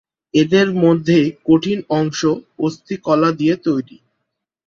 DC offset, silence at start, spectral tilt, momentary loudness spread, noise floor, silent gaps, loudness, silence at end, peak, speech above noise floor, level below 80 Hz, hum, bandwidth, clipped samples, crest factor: under 0.1%; 0.35 s; -6.5 dB/octave; 9 LU; -76 dBFS; none; -17 LUFS; 0.85 s; -2 dBFS; 60 dB; -56 dBFS; none; 7.2 kHz; under 0.1%; 16 dB